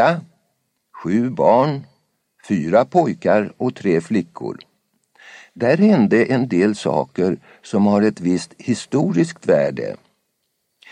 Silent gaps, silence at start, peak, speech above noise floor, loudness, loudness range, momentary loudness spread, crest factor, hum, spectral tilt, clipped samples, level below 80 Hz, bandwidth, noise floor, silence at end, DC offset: none; 0 s; -2 dBFS; 54 dB; -18 LUFS; 3 LU; 14 LU; 18 dB; none; -7 dB/octave; under 0.1%; -62 dBFS; 10.5 kHz; -71 dBFS; 1 s; under 0.1%